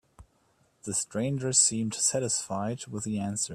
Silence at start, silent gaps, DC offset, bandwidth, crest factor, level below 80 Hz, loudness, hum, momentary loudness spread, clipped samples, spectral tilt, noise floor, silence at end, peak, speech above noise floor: 0.2 s; none; under 0.1%; 14.5 kHz; 22 dB; -64 dBFS; -27 LUFS; none; 12 LU; under 0.1%; -3.5 dB/octave; -68 dBFS; 0 s; -8 dBFS; 39 dB